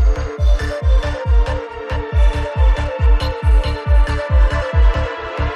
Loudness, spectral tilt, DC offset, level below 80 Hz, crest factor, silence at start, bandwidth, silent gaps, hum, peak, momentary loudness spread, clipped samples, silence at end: -18 LUFS; -6.5 dB/octave; under 0.1%; -16 dBFS; 10 dB; 0 s; 7 kHz; none; none; -4 dBFS; 6 LU; under 0.1%; 0 s